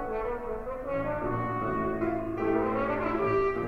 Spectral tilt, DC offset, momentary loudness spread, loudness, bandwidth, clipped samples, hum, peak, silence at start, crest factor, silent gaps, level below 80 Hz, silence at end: -9 dB/octave; under 0.1%; 6 LU; -30 LUFS; 6.6 kHz; under 0.1%; none; -16 dBFS; 0 s; 14 dB; none; -44 dBFS; 0 s